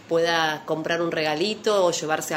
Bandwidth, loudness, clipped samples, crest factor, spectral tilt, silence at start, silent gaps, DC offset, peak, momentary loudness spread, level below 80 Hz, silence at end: 16 kHz; -23 LUFS; under 0.1%; 18 dB; -3.5 dB/octave; 0.05 s; none; under 0.1%; -6 dBFS; 4 LU; -68 dBFS; 0 s